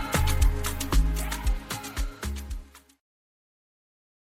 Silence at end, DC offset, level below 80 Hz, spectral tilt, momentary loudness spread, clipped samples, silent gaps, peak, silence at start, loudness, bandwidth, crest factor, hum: 1.55 s; under 0.1%; -30 dBFS; -4 dB/octave; 11 LU; under 0.1%; none; -10 dBFS; 0 s; -29 LUFS; 17 kHz; 18 dB; none